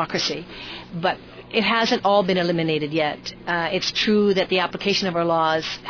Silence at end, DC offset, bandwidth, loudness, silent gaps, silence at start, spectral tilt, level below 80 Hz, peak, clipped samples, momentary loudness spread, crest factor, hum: 0 s; under 0.1%; 5.4 kHz; -21 LUFS; none; 0 s; -4.5 dB/octave; -54 dBFS; -6 dBFS; under 0.1%; 10 LU; 16 dB; none